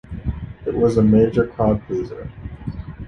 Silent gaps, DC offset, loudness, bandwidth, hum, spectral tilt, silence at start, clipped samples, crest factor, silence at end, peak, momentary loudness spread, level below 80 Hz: none; under 0.1%; -19 LUFS; 6.6 kHz; none; -9.5 dB/octave; 0.1 s; under 0.1%; 16 dB; 0 s; -4 dBFS; 17 LU; -34 dBFS